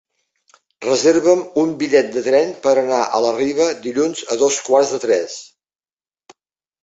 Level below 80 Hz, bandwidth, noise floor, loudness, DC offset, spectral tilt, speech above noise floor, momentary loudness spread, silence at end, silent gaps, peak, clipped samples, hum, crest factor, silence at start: -62 dBFS; 8 kHz; under -90 dBFS; -17 LUFS; under 0.1%; -3.5 dB/octave; over 74 dB; 5 LU; 1.4 s; none; -2 dBFS; under 0.1%; none; 16 dB; 0.8 s